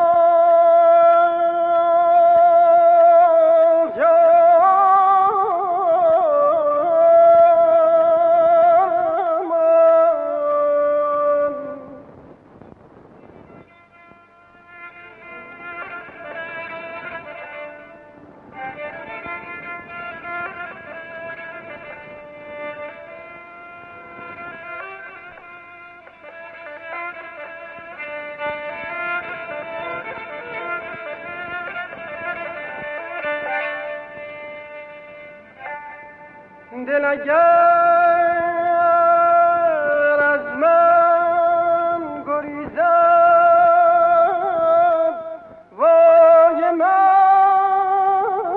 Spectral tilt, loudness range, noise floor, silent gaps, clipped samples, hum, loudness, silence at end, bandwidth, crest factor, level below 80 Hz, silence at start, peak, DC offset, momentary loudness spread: -7 dB/octave; 21 LU; -49 dBFS; none; under 0.1%; none; -15 LUFS; 0 s; 4.1 kHz; 14 dB; -62 dBFS; 0 s; -4 dBFS; under 0.1%; 22 LU